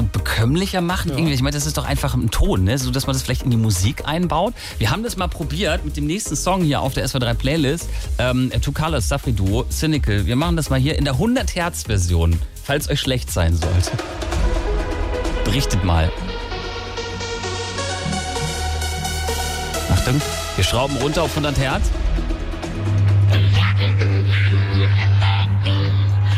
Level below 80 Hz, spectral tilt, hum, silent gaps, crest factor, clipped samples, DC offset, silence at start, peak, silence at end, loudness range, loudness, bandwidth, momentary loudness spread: -28 dBFS; -5 dB/octave; none; none; 12 dB; under 0.1%; under 0.1%; 0 s; -6 dBFS; 0 s; 5 LU; -20 LUFS; 16 kHz; 7 LU